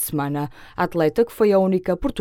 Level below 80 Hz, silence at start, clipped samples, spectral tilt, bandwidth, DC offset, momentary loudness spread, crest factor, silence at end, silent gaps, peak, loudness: -42 dBFS; 0 s; under 0.1%; -6 dB/octave; 17.5 kHz; under 0.1%; 9 LU; 16 dB; 0 s; none; -6 dBFS; -21 LUFS